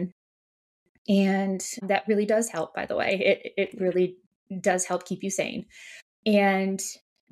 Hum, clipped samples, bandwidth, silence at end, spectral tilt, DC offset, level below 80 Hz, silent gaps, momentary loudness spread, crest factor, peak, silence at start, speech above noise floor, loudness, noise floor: none; under 0.1%; 14 kHz; 0.35 s; -4.5 dB/octave; under 0.1%; -70 dBFS; 0.12-1.05 s, 4.26-4.46 s, 6.02-6.23 s; 15 LU; 18 dB; -8 dBFS; 0 s; over 64 dB; -26 LUFS; under -90 dBFS